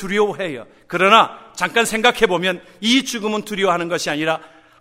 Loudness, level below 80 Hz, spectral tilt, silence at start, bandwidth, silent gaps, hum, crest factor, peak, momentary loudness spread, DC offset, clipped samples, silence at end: -18 LUFS; -52 dBFS; -3 dB/octave; 0 s; 16 kHz; none; none; 18 dB; 0 dBFS; 13 LU; under 0.1%; under 0.1%; 0.35 s